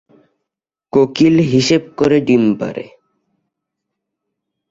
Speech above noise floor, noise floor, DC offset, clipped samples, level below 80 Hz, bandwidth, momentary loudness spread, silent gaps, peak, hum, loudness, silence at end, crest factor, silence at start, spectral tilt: 69 dB; -82 dBFS; under 0.1%; under 0.1%; -52 dBFS; 7.8 kHz; 9 LU; none; -2 dBFS; none; -14 LUFS; 1.85 s; 16 dB; 0.95 s; -6 dB/octave